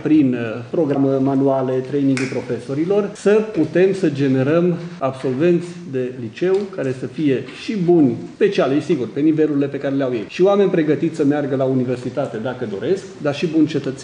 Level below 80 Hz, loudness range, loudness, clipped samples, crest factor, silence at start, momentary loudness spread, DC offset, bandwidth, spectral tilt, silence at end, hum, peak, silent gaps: -62 dBFS; 2 LU; -19 LUFS; under 0.1%; 14 dB; 0 s; 8 LU; under 0.1%; 10 kHz; -7.5 dB/octave; 0 s; none; -4 dBFS; none